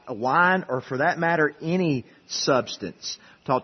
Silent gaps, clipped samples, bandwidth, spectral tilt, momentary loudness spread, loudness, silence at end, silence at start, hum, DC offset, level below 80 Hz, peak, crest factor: none; under 0.1%; 6.4 kHz; -4.5 dB/octave; 13 LU; -24 LUFS; 0 s; 0.05 s; none; under 0.1%; -66 dBFS; -6 dBFS; 18 dB